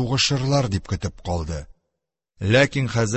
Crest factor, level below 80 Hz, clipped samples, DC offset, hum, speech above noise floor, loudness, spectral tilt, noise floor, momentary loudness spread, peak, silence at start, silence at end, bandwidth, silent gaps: 18 dB; -38 dBFS; under 0.1%; under 0.1%; none; 61 dB; -22 LUFS; -5 dB/octave; -82 dBFS; 12 LU; -4 dBFS; 0 s; 0 s; 8.6 kHz; none